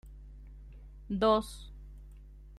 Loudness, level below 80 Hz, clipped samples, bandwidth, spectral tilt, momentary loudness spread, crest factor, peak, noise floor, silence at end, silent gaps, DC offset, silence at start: -30 LUFS; -48 dBFS; under 0.1%; 13.5 kHz; -6 dB/octave; 26 LU; 22 dB; -14 dBFS; -51 dBFS; 0 s; none; under 0.1%; 0.05 s